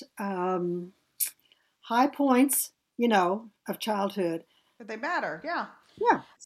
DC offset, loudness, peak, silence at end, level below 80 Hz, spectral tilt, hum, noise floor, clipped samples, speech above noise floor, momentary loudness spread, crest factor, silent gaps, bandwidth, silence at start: under 0.1%; -28 LUFS; -10 dBFS; 0.25 s; -78 dBFS; -4 dB/octave; none; -67 dBFS; under 0.1%; 39 dB; 13 LU; 20 dB; none; 16 kHz; 0 s